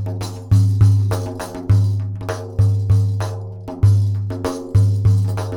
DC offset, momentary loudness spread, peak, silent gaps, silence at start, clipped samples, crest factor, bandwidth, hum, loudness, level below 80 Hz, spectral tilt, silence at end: under 0.1%; 12 LU; -2 dBFS; none; 0 s; under 0.1%; 14 dB; 11.5 kHz; none; -18 LUFS; -36 dBFS; -7.5 dB/octave; 0 s